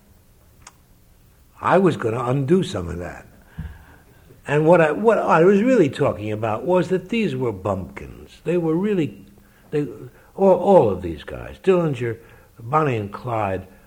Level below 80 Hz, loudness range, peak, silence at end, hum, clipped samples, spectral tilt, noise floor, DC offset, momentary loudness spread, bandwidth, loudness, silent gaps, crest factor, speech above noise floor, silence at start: -48 dBFS; 5 LU; -2 dBFS; 0.2 s; none; under 0.1%; -7.5 dB/octave; -53 dBFS; under 0.1%; 20 LU; 16 kHz; -20 LUFS; none; 20 dB; 33 dB; 1.6 s